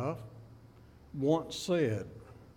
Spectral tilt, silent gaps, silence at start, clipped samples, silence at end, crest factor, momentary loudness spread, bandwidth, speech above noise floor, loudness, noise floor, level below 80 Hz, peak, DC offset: -6 dB/octave; none; 0 s; under 0.1%; 0.05 s; 18 dB; 21 LU; 17 kHz; 25 dB; -33 LUFS; -56 dBFS; -62 dBFS; -16 dBFS; under 0.1%